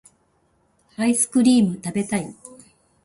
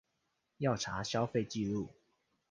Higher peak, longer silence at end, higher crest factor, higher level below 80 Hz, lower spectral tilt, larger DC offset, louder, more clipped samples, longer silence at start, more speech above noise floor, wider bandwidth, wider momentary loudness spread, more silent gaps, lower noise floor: first, -6 dBFS vs -18 dBFS; about the same, 0.55 s vs 0.6 s; about the same, 16 dB vs 20 dB; about the same, -60 dBFS vs -64 dBFS; about the same, -4.5 dB/octave vs -5 dB/octave; neither; first, -20 LUFS vs -36 LUFS; neither; first, 1 s vs 0.6 s; about the same, 45 dB vs 47 dB; first, 11.5 kHz vs 10 kHz; first, 15 LU vs 5 LU; neither; second, -64 dBFS vs -82 dBFS